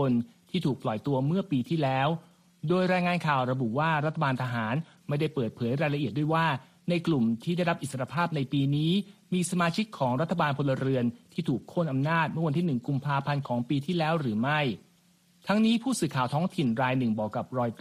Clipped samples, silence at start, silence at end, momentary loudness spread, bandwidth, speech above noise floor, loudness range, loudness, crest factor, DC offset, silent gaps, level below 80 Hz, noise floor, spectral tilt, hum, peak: under 0.1%; 0 s; 0.05 s; 6 LU; 14 kHz; 36 dB; 1 LU; -28 LUFS; 16 dB; under 0.1%; none; -66 dBFS; -63 dBFS; -6.5 dB/octave; none; -12 dBFS